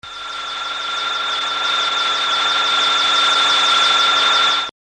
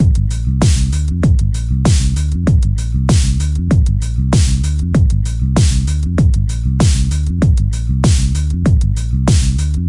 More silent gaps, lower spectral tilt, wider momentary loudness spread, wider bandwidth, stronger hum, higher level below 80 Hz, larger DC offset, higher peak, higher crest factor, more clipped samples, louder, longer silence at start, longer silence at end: neither; second, 1 dB/octave vs -6 dB/octave; first, 11 LU vs 4 LU; about the same, 10.5 kHz vs 11.5 kHz; neither; second, -60 dBFS vs -16 dBFS; neither; second, -4 dBFS vs 0 dBFS; about the same, 14 dB vs 12 dB; neither; about the same, -15 LUFS vs -15 LUFS; about the same, 0.05 s vs 0 s; first, 0.3 s vs 0 s